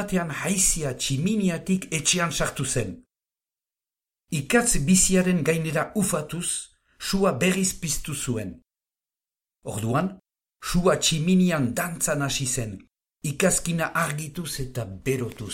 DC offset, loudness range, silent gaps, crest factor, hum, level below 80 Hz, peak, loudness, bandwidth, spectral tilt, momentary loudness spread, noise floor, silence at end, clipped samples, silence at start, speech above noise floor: under 0.1%; 4 LU; none; 20 dB; none; -42 dBFS; -6 dBFS; -24 LUFS; 16.5 kHz; -4 dB/octave; 12 LU; under -90 dBFS; 0 s; under 0.1%; 0 s; over 66 dB